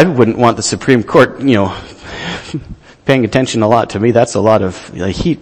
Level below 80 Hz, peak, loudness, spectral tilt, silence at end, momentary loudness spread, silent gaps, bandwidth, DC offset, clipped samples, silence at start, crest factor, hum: -38 dBFS; 0 dBFS; -13 LUFS; -5.5 dB/octave; 0 s; 13 LU; none; 11.5 kHz; under 0.1%; 0.6%; 0 s; 12 dB; none